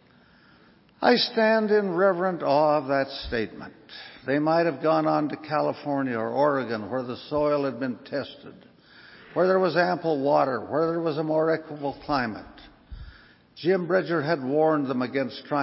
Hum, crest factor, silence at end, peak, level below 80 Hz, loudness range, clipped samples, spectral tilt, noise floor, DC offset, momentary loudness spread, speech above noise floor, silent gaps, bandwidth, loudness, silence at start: none; 20 dB; 0 s; -6 dBFS; -56 dBFS; 5 LU; under 0.1%; -9.5 dB/octave; -56 dBFS; under 0.1%; 12 LU; 32 dB; none; 5.8 kHz; -25 LUFS; 1 s